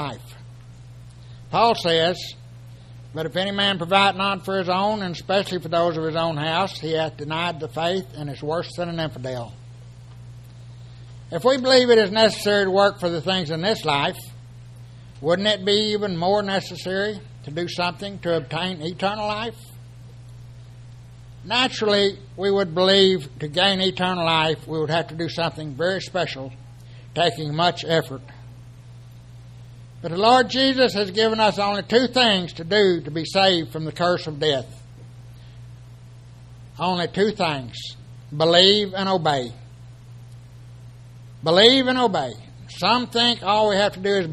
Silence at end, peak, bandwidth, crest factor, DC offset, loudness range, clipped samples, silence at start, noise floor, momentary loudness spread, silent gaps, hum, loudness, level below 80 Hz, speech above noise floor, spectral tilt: 0 s; 0 dBFS; 13.5 kHz; 22 dB; under 0.1%; 8 LU; under 0.1%; 0 s; -43 dBFS; 17 LU; none; none; -21 LUFS; -52 dBFS; 22 dB; -4.5 dB/octave